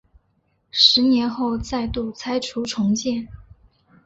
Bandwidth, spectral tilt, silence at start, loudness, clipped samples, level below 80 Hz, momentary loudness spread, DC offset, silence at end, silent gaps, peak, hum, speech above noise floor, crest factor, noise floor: 8 kHz; -4 dB/octave; 0.75 s; -20 LUFS; under 0.1%; -44 dBFS; 14 LU; under 0.1%; 0.65 s; none; -2 dBFS; none; 46 dB; 20 dB; -67 dBFS